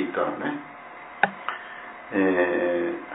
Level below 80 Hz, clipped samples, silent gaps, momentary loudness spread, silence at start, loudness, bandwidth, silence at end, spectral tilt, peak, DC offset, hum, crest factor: -70 dBFS; under 0.1%; none; 17 LU; 0 s; -26 LUFS; 4 kHz; 0 s; -9.5 dB/octave; -2 dBFS; under 0.1%; none; 24 dB